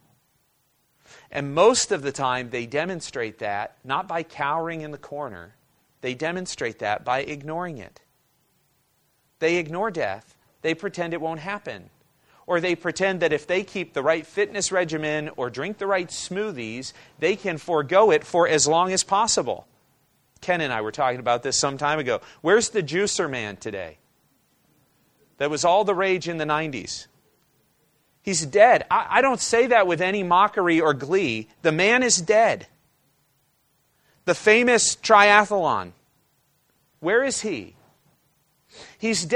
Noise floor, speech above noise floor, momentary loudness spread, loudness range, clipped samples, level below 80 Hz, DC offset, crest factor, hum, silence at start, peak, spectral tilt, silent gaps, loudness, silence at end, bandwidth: -68 dBFS; 45 dB; 14 LU; 10 LU; under 0.1%; -62 dBFS; under 0.1%; 24 dB; none; 1.3 s; 0 dBFS; -3 dB/octave; none; -22 LUFS; 0 s; 12.5 kHz